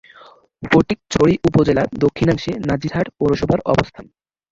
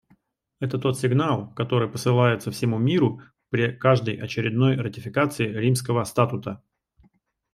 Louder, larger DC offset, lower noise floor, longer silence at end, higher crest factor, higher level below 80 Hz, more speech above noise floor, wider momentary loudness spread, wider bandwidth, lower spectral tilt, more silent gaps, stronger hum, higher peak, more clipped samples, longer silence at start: first, -17 LUFS vs -24 LUFS; neither; second, -46 dBFS vs -64 dBFS; second, 0.5 s vs 0.95 s; about the same, 16 dB vs 20 dB; first, -40 dBFS vs -60 dBFS; second, 29 dB vs 41 dB; second, 6 LU vs 9 LU; second, 7.8 kHz vs 14.5 kHz; about the same, -7 dB/octave vs -6.5 dB/octave; neither; neither; about the same, -2 dBFS vs -4 dBFS; neither; about the same, 0.6 s vs 0.6 s